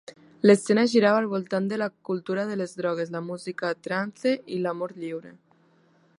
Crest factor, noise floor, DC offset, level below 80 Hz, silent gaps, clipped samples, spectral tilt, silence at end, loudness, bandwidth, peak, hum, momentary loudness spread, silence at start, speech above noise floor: 22 dB; -62 dBFS; under 0.1%; -74 dBFS; none; under 0.1%; -5.5 dB/octave; 0.9 s; -25 LUFS; 11 kHz; -4 dBFS; none; 13 LU; 0.45 s; 37 dB